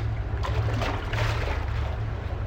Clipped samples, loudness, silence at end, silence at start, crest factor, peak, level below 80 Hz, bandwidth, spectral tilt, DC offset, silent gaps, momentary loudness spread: under 0.1%; -29 LUFS; 0 s; 0 s; 14 dB; -12 dBFS; -32 dBFS; 15.5 kHz; -6 dB/octave; under 0.1%; none; 4 LU